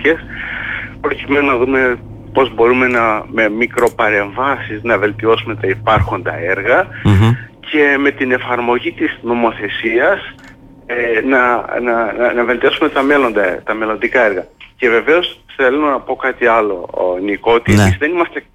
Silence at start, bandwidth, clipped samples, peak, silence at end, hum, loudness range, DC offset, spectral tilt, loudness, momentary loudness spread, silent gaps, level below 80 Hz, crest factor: 0 s; 15 kHz; under 0.1%; -2 dBFS; 0.15 s; none; 2 LU; under 0.1%; -6.5 dB/octave; -14 LUFS; 8 LU; none; -38 dBFS; 12 dB